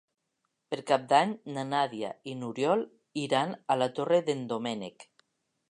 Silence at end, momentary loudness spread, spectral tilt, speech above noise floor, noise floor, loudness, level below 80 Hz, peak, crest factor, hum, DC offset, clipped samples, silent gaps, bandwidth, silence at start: 0.7 s; 13 LU; -5 dB/octave; 51 dB; -81 dBFS; -30 LUFS; -82 dBFS; -10 dBFS; 22 dB; none; under 0.1%; under 0.1%; none; 11 kHz; 0.7 s